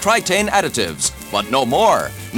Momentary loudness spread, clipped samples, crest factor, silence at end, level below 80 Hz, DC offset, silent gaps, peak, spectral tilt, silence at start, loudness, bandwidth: 6 LU; under 0.1%; 16 dB; 0 s; -42 dBFS; under 0.1%; none; -2 dBFS; -2.5 dB/octave; 0 s; -17 LUFS; over 20 kHz